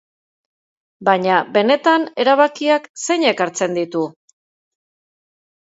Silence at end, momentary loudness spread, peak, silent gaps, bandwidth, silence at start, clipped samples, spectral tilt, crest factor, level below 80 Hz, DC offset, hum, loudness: 1.7 s; 8 LU; 0 dBFS; 2.89-2.94 s; 8 kHz; 1 s; under 0.1%; -3.5 dB/octave; 18 dB; -72 dBFS; under 0.1%; none; -17 LUFS